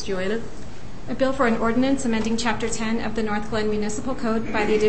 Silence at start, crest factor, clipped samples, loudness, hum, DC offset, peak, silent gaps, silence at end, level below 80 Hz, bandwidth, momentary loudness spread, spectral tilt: 0 s; 14 dB; under 0.1%; -24 LUFS; none; 4%; -8 dBFS; none; 0 s; -40 dBFS; 8.8 kHz; 11 LU; -4.5 dB/octave